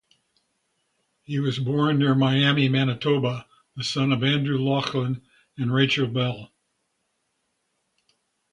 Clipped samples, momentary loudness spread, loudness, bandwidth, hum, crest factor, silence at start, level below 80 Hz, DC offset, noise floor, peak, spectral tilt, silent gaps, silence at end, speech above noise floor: under 0.1%; 11 LU; -23 LUFS; 10.5 kHz; none; 18 dB; 1.3 s; -62 dBFS; under 0.1%; -75 dBFS; -6 dBFS; -6.5 dB/octave; none; 2.05 s; 52 dB